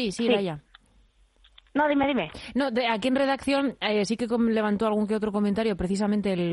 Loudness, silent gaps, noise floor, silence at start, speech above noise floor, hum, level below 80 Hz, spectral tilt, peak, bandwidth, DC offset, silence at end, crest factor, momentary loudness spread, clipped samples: -26 LUFS; none; -61 dBFS; 0 s; 36 dB; none; -52 dBFS; -5.5 dB/octave; -10 dBFS; 11.5 kHz; under 0.1%; 0 s; 16 dB; 4 LU; under 0.1%